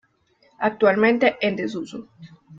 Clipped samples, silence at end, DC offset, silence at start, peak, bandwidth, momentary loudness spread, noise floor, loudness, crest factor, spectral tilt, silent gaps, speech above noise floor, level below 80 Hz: under 0.1%; 0 s; under 0.1%; 0.6 s; -6 dBFS; 7.6 kHz; 16 LU; -62 dBFS; -20 LUFS; 18 dB; -6 dB/octave; none; 40 dB; -64 dBFS